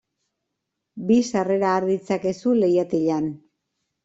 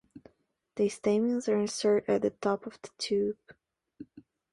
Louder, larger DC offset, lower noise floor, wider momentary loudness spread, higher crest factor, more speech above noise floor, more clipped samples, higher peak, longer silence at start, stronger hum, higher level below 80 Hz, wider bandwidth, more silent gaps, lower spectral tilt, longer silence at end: first, -22 LUFS vs -30 LUFS; neither; first, -80 dBFS vs -68 dBFS; second, 6 LU vs 18 LU; about the same, 16 dB vs 16 dB; first, 60 dB vs 39 dB; neither; first, -8 dBFS vs -16 dBFS; first, 0.95 s vs 0.15 s; neither; first, -64 dBFS vs -70 dBFS; second, 8 kHz vs 11.5 kHz; neither; first, -6.5 dB/octave vs -5 dB/octave; first, 0.7 s vs 0.3 s